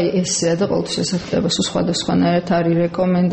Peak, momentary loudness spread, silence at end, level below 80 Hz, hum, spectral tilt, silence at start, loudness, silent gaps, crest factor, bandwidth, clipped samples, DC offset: -6 dBFS; 3 LU; 0 s; -48 dBFS; none; -5 dB/octave; 0 s; -18 LUFS; none; 12 dB; 8.6 kHz; under 0.1%; under 0.1%